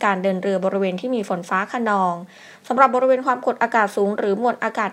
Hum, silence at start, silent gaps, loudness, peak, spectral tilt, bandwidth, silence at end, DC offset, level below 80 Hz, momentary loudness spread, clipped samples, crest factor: none; 0 s; none; -20 LUFS; 0 dBFS; -6 dB/octave; 15.5 kHz; 0 s; under 0.1%; -76 dBFS; 7 LU; under 0.1%; 20 dB